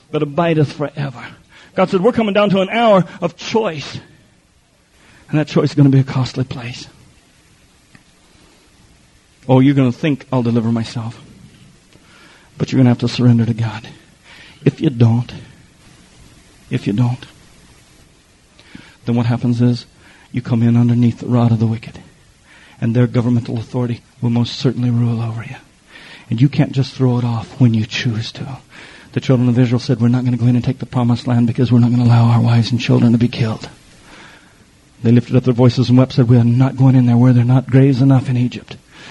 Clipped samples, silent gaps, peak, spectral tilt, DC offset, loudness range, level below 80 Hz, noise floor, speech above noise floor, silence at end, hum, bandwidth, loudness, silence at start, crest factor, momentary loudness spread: under 0.1%; none; 0 dBFS; -8 dB/octave; under 0.1%; 7 LU; -50 dBFS; -54 dBFS; 40 dB; 0 s; none; 8.8 kHz; -15 LUFS; 0.1 s; 16 dB; 15 LU